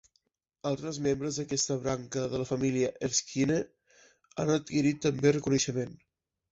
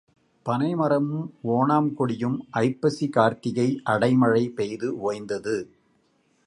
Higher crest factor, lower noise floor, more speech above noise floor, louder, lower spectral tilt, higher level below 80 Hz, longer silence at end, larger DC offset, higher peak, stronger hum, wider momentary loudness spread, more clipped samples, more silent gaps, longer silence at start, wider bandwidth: about the same, 20 dB vs 18 dB; first, -76 dBFS vs -66 dBFS; first, 46 dB vs 42 dB; second, -30 LUFS vs -24 LUFS; second, -4.5 dB/octave vs -7.5 dB/octave; first, -60 dBFS vs -66 dBFS; second, 0.55 s vs 0.8 s; neither; second, -12 dBFS vs -6 dBFS; neither; about the same, 8 LU vs 9 LU; neither; neither; first, 0.65 s vs 0.45 s; second, 8.2 kHz vs 11 kHz